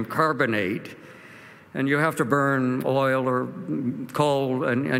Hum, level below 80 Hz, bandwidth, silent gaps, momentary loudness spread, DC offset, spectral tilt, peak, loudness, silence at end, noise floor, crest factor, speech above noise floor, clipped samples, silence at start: none; -70 dBFS; 16 kHz; none; 17 LU; under 0.1%; -6.5 dB/octave; -6 dBFS; -24 LUFS; 0 s; -47 dBFS; 18 dB; 23 dB; under 0.1%; 0 s